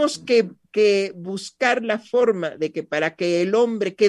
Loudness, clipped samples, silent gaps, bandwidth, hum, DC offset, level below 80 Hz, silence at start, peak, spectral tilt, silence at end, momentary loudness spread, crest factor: -21 LUFS; under 0.1%; none; 11.5 kHz; none; under 0.1%; -72 dBFS; 0 s; -4 dBFS; -4.5 dB/octave; 0 s; 8 LU; 16 dB